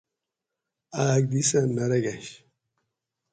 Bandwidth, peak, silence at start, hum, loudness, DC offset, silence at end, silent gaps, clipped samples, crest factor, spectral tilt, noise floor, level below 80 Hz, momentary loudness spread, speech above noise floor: 9.6 kHz; -10 dBFS; 0.9 s; none; -24 LUFS; under 0.1%; 0.95 s; none; under 0.1%; 18 dB; -5 dB/octave; -86 dBFS; -64 dBFS; 15 LU; 62 dB